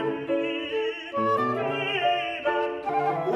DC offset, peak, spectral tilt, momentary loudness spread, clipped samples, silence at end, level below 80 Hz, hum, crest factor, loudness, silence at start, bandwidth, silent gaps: under 0.1%; -12 dBFS; -6 dB/octave; 4 LU; under 0.1%; 0 s; -66 dBFS; none; 14 dB; -26 LUFS; 0 s; 12 kHz; none